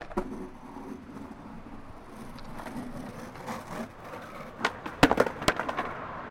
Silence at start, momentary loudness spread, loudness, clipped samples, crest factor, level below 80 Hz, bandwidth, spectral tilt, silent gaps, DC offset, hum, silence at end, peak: 0 s; 20 LU; -32 LUFS; under 0.1%; 28 dB; -48 dBFS; 16.5 kHz; -4.5 dB/octave; none; under 0.1%; none; 0 s; -6 dBFS